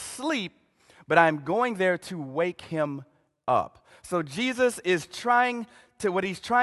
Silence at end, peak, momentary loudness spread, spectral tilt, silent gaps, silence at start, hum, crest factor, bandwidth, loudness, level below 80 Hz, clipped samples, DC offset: 0 s; -4 dBFS; 12 LU; -4.5 dB/octave; none; 0 s; none; 24 dB; 12.5 kHz; -26 LUFS; -66 dBFS; under 0.1%; under 0.1%